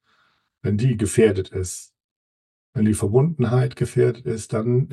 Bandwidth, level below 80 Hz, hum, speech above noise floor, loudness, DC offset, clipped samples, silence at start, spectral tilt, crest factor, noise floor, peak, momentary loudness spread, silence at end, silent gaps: 12.5 kHz; -50 dBFS; none; 45 dB; -21 LUFS; under 0.1%; under 0.1%; 0.65 s; -7 dB/octave; 18 dB; -65 dBFS; -4 dBFS; 11 LU; 0 s; 2.04-2.73 s